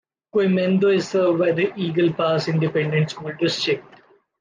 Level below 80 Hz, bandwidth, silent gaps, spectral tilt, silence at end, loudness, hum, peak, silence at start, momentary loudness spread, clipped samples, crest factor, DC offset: -66 dBFS; 9.6 kHz; none; -6.5 dB/octave; 0.6 s; -21 LUFS; none; -8 dBFS; 0.35 s; 6 LU; under 0.1%; 12 dB; under 0.1%